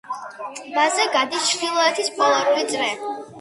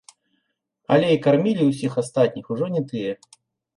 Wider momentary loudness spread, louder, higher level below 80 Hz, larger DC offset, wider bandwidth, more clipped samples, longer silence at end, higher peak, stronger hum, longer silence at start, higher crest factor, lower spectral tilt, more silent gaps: first, 13 LU vs 10 LU; about the same, -20 LUFS vs -21 LUFS; second, -72 dBFS vs -66 dBFS; neither; about the same, 11.5 kHz vs 11.5 kHz; neither; second, 0 s vs 0.65 s; about the same, -4 dBFS vs -4 dBFS; neither; second, 0.05 s vs 0.9 s; about the same, 16 dB vs 18 dB; second, -0.5 dB/octave vs -7 dB/octave; neither